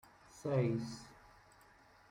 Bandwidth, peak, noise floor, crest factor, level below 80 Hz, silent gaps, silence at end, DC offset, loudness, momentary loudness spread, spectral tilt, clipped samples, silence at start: 15.5 kHz; -22 dBFS; -64 dBFS; 20 dB; -70 dBFS; none; 0.95 s; under 0.1%; -38 LUFS; 23 LU; -7.5 dB/octave; under 0.1%; 0.35 s